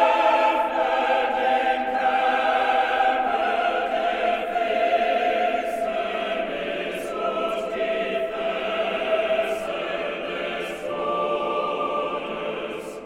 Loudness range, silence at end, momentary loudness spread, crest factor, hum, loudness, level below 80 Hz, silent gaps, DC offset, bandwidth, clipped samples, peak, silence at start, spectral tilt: 5 LU; 0 s; 7 LU; 16 dB; none; -24 LUFS; -56 dBFS; none; under 0.1%; 15 kHz; under 0.1%; -8 dBFS; 0 s; -4 dB/octave